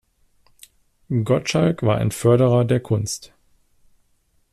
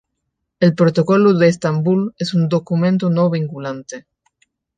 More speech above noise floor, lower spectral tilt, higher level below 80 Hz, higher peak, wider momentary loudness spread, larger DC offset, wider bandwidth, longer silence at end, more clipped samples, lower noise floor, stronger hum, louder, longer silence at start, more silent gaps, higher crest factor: second, 45 dB vs 60 dB; about the same, -6.5 dB/octave vs -7.5 dB/octave; first, -52 dBFS vs -62 dBFS; second, -6 dBFS vs -2 dBFS; second, 9 LU vs 14 LU; neither; first, 13.5 kHz vs 9.2 kHz; first, 1.3 s vs 0.75 s; neither; second, -63 dBFS vs -75 dBFS; neither; second, -20 LUFS vs -16 LUFS; first, 1.1 s vs 0.6 s; neither; about the same, 16 dB vs 16 dB